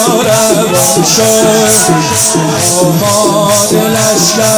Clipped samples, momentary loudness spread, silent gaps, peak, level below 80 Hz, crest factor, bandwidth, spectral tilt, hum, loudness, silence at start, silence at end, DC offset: under 0.1%; 2 LU; none; 0 dBFS; -42 dBFS; 8 dB; over 20 kHz; -3 dB/octave; none; -7 LUFS; 0 s; 0 s; under 0.1%